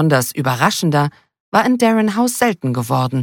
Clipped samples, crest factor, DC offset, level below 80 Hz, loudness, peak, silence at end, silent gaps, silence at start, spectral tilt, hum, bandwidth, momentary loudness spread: under 0.1%; 14 dB; under 0.1%; -58 dBFS; -16 LUFS; -2 dBFS; 0 s; 1.40-1.52 s; 0 s; -5.5 dB/octave; none; 17.5 kHz; 5 LU